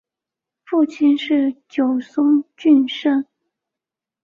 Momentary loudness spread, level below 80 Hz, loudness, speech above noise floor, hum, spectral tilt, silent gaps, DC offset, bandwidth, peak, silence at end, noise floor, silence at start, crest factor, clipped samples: 7 LU; -68 dBFS; -18 LUFS; 70 dB; none; -5 dB/octave; none; under 0.1%; 7 kHz; -4 dBFS; 1 s; -87 dBFS; 0.7 s; 14 dB; under 0.1%